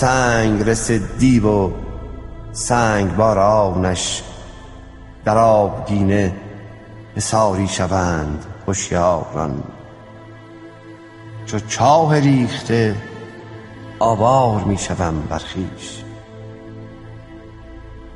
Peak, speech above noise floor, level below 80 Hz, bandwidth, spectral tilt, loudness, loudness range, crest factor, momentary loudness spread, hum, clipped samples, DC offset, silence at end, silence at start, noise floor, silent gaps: -2 dBFS; 22 dB; -36 dBFS; 11.5 kHz; -5.5 dB/octave; -17 LUFS; 6 LU; 16 dB; 24 LU; none; under 0.1%; under 0.1%; 0 s; 0 s; -39 dBFS; none